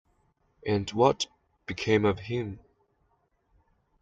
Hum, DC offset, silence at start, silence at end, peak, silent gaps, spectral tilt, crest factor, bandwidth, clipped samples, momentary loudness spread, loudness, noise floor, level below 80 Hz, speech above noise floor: none; under 0.1%; 0.65 s; 1.45 s; -8 dBFS; none; -5.5 dB/octave; 24 dB; 9 kHz; under 0.1%; 15 LU; -28 LUFS; -72 dBFS; -60 dBFS; 45 dB